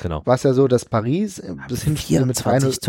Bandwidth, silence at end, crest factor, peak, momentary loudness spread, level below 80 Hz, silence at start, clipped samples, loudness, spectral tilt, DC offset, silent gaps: 17 kHz; 0 s; 16 dB; -4 dBFS; 10 LU; -42 dBFS; 0 s; under 0.1%; -19 LUFS; -6 dB/octave; under 0.1%; none